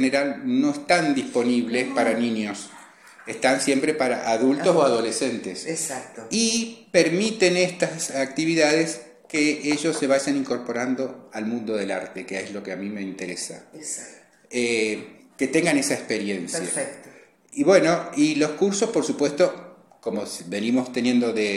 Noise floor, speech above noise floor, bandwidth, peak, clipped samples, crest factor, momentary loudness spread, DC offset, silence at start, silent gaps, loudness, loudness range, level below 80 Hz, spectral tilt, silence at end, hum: -50 dBFS; 27 dB; 14 kHz; -2 dBFS; under 0.1%; 20 dB; 12 LU; under 0.1%; 0 s; none; -23 LUFS; 7 LU; -68 dBFS; -3.5 dB/octave; 0 s; none